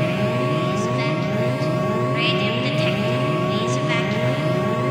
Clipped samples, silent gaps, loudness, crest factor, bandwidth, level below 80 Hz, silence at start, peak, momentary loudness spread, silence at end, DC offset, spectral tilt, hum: under 0.1%; none; -21 LUFS; 14 dB; 15 kHz; -54 dBFS; 0 s; -8 dBFS; 2 LU; 0 s; under 0.1%; -6 dB/octave; none